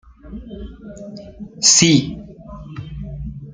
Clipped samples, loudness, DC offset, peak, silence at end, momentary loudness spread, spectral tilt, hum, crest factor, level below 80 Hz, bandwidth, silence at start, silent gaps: under 0.1%; -12 LUFS; under 0.1%; 0 dBFS; 0 s; 26 LU; -2.5 dB/octave; none; 20 dB; -40 dBFS; 10.5 kHz; 0.25 s; none